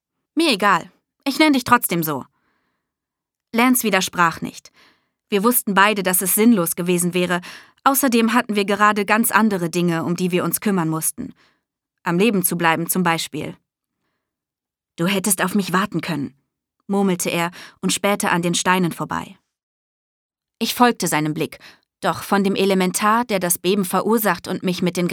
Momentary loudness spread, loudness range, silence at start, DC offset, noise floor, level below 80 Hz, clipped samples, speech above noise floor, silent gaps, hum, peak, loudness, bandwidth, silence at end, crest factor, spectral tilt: 11 LU; 5 LU; 0.35 s; under 0.1%; -87 dBFS; -62 dBFS; under 0.1%; 69 dB; 19.63-20.29 s; none; 0 dBFS; -19 LUFS; over 20 kHz; 0 s; 20 dB; -4 dB/octave